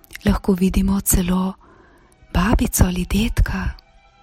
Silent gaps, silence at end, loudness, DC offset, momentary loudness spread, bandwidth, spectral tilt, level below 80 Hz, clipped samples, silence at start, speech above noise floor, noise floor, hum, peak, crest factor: none; 0.45 s; -20 LUFS; under 0.1%; 8 LU; 16.5 kHz; -5 dB/octave; -24 dBFS; under 0.1%; 0.15 s; 32 dB; -50 dBFS; none; 0 dBFS; 20 dB